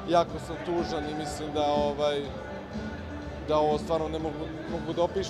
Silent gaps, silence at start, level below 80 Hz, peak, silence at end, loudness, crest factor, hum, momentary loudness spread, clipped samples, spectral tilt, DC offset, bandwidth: none; 0 s; -46 dBFS; -10 dBFS; 0 s; -30 LUFS; 18 dB; none; 11 LU; under 0.1%; -5.5 dB/octave; under 0.1%; 13 kHz